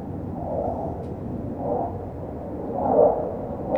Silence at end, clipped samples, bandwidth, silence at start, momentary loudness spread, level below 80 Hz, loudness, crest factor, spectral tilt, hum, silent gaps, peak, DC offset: 0 s; under 0.1%; 4.3 kHz; 0 s; 14 LU; -44 dBFS; -26 LUFS; 20 dB; -11 dB/octave; none; none; -6 dBFS; under 0.1%